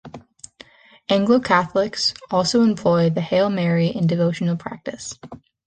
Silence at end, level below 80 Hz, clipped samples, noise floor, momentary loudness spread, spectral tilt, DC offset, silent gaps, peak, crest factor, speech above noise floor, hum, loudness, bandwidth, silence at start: 0.3 s; -56 dBFS; under 0.1%; -48 dBFS; 15 LU; -5.5 dB/octave; under 0.1%; none; -2 dBFS; 18 dB; 28 dB; none; -19 LUFS; 9.6 kHz; 0.05 s